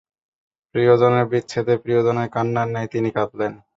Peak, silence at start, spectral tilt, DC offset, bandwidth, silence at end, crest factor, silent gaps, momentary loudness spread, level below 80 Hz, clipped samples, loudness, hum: -2 dBFS; 0.75 s; -7.5 dB/octave; under 0.1%; 7.8 kHz; 0.2 s; 18 dB; none; 9 LU; -58 dBFS; under 0.1%; -20 LUFS; none